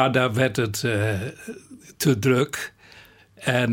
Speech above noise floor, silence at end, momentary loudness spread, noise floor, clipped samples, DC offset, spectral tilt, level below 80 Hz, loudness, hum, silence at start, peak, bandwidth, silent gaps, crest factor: 27 dB; 0 s; 16 LU; -50 dBFS; under 0.1%; under 0.1%; -5 dB/octave; -58 dBFS; -23 LUFS; none; 0 s; -4 dBFS; 17 kHz; none; 20 dB